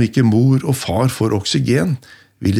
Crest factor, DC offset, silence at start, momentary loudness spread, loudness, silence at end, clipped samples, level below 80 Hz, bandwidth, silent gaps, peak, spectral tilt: 12 dB; under 0.1%; 0 s; 8 LU; -16 LUFS; 0 s; under 0.1%; -48 dBFS; 15 kHz; none; -2 dBFS; -6 dB/octave